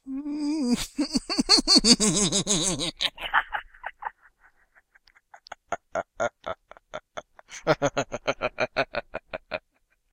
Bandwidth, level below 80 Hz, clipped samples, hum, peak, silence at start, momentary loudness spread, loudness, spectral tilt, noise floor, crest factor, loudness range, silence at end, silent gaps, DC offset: 16.5 kHz; -48 dBFS; under 0.1%; none; -2 dBFS; 0.05 s; 21 LU; -24 LUFS; -2.5 dB/octave; -70 dBFS; 26 dB; 15 LU; 0.55 s; none; under 0.1%